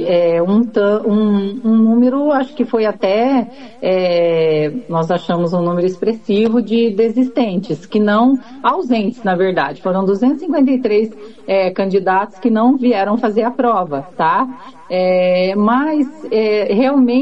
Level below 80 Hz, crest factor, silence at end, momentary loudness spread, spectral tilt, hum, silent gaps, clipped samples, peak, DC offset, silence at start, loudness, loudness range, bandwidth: -58 dBFS; 12 dB; 0 s; 5 LU; -8 dB/octave; none; none; under 0.1%; -2 dBFS; 0.8%; 0 s; -15 LUFS; 1 LU; 7.8 kHz